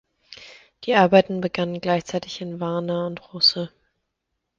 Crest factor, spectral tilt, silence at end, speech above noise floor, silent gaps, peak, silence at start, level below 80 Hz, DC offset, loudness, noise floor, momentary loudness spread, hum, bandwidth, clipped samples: 22 dB; -5.5 dB/octave; 0.9 s; 57 dB; none; -2 dBFS; 0.3 s; -62 dBFS; under 0.1%; -21 LUFS; -79 dBFS; 18 LU; none; 7.6 kHz; under 0.1%